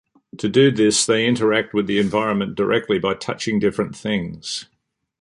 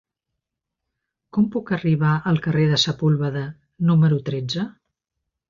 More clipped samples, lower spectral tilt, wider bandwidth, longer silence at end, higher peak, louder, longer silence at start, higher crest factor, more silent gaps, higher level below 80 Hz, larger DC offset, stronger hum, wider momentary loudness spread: neither; second, -4.5 dB/octave vs -6.5 dB/octave; first, 11.5 kHz vs 7.4 kHz; second, 0.6 s vs 0.8 s; first, -2 dBFS vs -6 dBFS; about the same, -20 LUFS vs -21 LUFS; second, 0.35 s vs 1.35 s; about the same, 18 dB vs 16 dB; neither; about the same, -54 dBFS vs -56 dBFS; neither; neither; about the same, 11 LU vs 10 LU